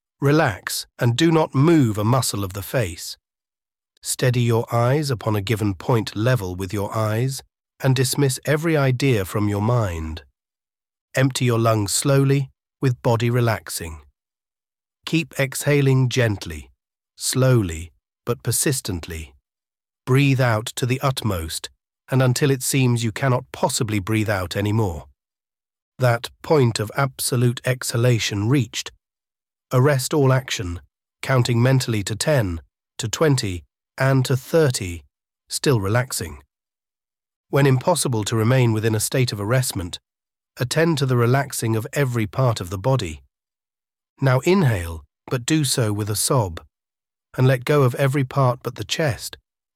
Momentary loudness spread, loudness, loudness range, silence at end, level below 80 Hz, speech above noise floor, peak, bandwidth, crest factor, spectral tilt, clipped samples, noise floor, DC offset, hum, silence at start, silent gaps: 12 LU; -21 LUFS; 3 LU; 0.45 s; -48 dBFS; over 70 dB; -4 dBFS; 16 kHz; 18 dB; -5.5 dB/octave; under 0.1%; under -90 dBFS; under 0.1%; none; 0.2 s; 3.97-4.02 s, 11.01-11.08 s, 25.82-25.92 s, 37.36-37.44 s, 44.09-44.16 s